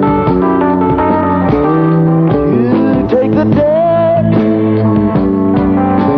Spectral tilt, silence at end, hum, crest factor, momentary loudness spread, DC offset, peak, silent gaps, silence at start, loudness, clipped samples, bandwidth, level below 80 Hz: -11 dB/octave; 0 s; none; 8 dB; 1 LU; under 0.1%; 0 dBFS; none; 0 s; -11 LUFS; under 0.1%; 5.4 kHz; -32 dBFS